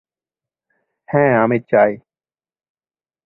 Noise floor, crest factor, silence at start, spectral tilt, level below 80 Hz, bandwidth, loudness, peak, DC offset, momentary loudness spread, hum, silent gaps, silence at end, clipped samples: under -90 dBFS; 18 dB; 1.1 s; -11.5 dB/octave; -60 dBFS; 4 kHz; -16 LUFS; 0 dBFS; under 0.1%; 7 LU; none; none; 1.3 s; under 0.1%